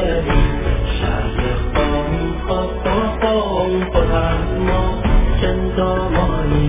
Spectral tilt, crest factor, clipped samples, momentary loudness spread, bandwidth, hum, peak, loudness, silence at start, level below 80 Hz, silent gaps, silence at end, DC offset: -11 dB/octave; 16 dB; under 0.1%; 3 LU; 3.8 kHz; none; -2 dBFS; -18 LUFS; 0 s; -20 dBFS; none; 0 s; under 0.1%